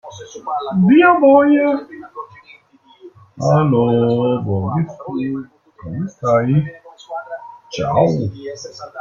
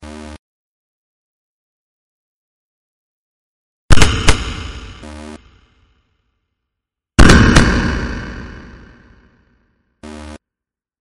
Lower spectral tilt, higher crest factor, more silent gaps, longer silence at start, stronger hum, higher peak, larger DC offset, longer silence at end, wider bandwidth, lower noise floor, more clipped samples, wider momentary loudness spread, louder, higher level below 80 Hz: first, -8 dB/octave vs -4.5 dB/octave; about the same, 16 dB vs 16 dB; second, none vs 0.39-3.89 s; about the same, 0.05 s vs 0.05 s; neither; about the same, -2 dBFS vs 0 dBFS; neither; second, 0 s vs 0.65 s; second, 7.4 kHz vs 11.5 kHz; second, -49 dBFS vs -86 dBFS; second, under 0.1% vs 0.1%; second, 22 LU vs 27 LU; second, -16 LUFS vs -13 LUFS; second, -52 dBFS vs -22 dBFS